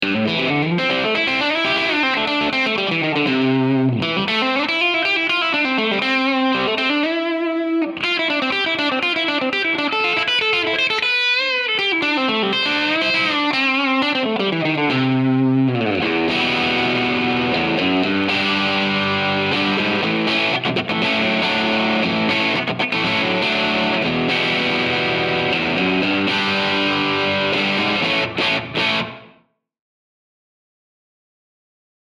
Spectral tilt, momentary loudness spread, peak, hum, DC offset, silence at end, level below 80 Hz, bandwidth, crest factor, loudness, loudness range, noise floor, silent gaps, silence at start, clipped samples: -5 dB/octave; 2 LU; -6 dBFS; none; under 0.1%; 2.75 s; -56 dBFS; 11 kHz; 14 dB; -17 LUFS; 2 LU; -58 dBFS; none; 0 s; under 0.1%